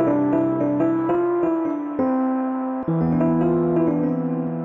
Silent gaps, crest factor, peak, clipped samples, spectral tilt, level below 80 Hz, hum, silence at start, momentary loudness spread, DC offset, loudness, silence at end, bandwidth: none; 12 dB; -8 dBFS; under 0.1%; -11.5 dB/octave; -52 dBFS; none; 0 s; 5 LU; under 0.1%; -21 LUFS; 0 s; 3.4 kHz